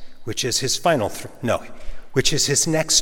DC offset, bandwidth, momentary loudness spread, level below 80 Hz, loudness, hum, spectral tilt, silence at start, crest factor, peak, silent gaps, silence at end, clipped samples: under 0.1%; 17.5 kHz; 11 LU; -40 dBFS; -21 LUFS; none; -2.5 dB/octave; 0 s; 18 dB; -2 dBFS; none; 0 s; under 0.1%